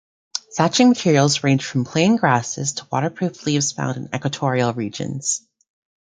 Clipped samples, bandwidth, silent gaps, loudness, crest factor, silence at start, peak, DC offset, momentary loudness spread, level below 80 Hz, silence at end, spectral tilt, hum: under 0.1%; 9.6 kHz; none; -20 LUFS; 18 dB; 0.35 s; -2 dBFS; under 0.1%; 11 LU; -60 dBFS; 0.7 s; -4.5 dB/octave; none